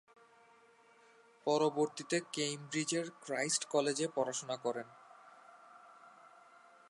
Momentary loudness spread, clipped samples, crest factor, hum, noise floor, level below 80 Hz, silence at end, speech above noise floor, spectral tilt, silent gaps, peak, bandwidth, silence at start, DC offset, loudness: 25 LU; under 0.1%; 20 dB; none; -65 dBFS; -90 dBFS; 0.6 s; 29 dB; -3 dB/octave; none; -18 dBFS; 11.5 kHz; 1.45 s; under 0.1%; -36 LUFS